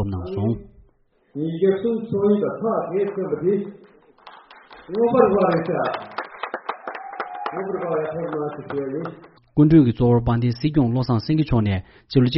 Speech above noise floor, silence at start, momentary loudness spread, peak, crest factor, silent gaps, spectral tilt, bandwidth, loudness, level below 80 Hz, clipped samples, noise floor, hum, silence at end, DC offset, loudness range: 40 dB; 0 s; 14 LU; -2 dBFS; 20 dB; none; -7.5 dB/octave; 5.8 kHz; -22 LUFS; -44 dBFS; under 0.1%; -60 dBFS; none; 0 s; under 0.1%; 8 LU